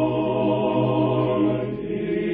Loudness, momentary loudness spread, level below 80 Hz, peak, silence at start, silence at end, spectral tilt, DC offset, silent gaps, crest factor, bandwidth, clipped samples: -22 LUFS; 6 LU; -50 dBFS; -10 dBFS; 0 s; 0 s; -11.5 dB/octave; under 0.1%; none; 12 dB; 4.1 kHz; under 0.1%